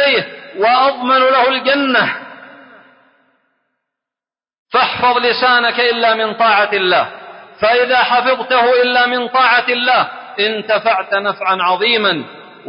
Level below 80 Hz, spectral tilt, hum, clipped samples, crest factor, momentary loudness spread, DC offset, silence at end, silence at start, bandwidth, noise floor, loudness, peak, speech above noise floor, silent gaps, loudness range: -60 dBFS; -8 dB/octave; none; under 0.1%; 14 dB; 6 LU; under 0.1%; 0 s; 0 s; 5.4 kHz; -90 dBFS; -13 LUFS; -2 dBFS; 77 dB; 4.59-4.66 s; 6 LU